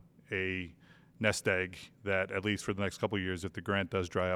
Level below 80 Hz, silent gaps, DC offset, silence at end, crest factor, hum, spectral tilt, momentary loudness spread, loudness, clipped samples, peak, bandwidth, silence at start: -62 dBFS; none; under 0.1%; 0 s; 22 dB; none; -5 dB/octave; 8 LU; -34 LUFS; under 0.1%; -12 dBFS; 15.5 kHz; 0.3 s